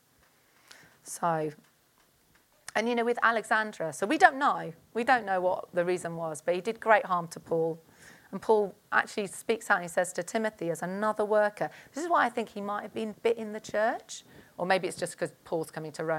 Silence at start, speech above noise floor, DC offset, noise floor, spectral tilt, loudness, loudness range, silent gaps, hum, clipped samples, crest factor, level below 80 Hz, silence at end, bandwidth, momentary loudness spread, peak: 1.05 s; 37 dB; under 0.1%; -66 dBFS; -4 dB/octave; -29 LUFS; 5 LU; none; none; under 0.1%; 26 dB; -74 dBFS; 0 s; 17 kHz; 12 LU; -4 dBFS